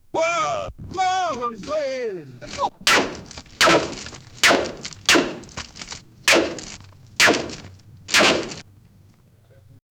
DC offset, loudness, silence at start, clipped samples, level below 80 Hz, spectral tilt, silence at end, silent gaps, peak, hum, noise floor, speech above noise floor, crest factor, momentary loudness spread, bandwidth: under 0.1%; -19 LUFS; 0.15 s; under 0.1%; -50 dBFS; -2 dB/octave; 1.35 s; none; 0 dBFS; none; -53 dBFS; 28 dB; 22 dB; 19 LU; over 20 kHz